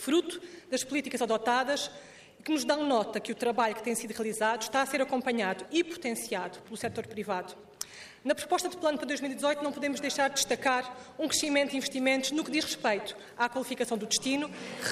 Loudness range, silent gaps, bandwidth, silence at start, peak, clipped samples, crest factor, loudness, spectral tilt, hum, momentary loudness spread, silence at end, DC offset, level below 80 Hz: 5 LU; none; 15 kHz; 0 s; -14 dBFS; under 0.1%; 18 dB; -31 LUFS; -2.5 dB/octave; none; 10 LU; 0 s; under 0.1%; -72 dBFS